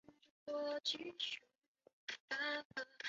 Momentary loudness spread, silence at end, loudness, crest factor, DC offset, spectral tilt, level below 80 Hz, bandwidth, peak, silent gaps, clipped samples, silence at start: 10 LU; 0 s; -44 LUFS; 18 dB; under 0.1%; 1.5 dB/octave; -90 dBFS; 7.6 kHz; -28 dBFS; 0.31-0.46 s, 1.58-1.62 s, 1.68-1.75 s, 1.93-2.07 s, 2.20-2.28 s, 2.65-2.70 s; under 0.1%; 0.1 s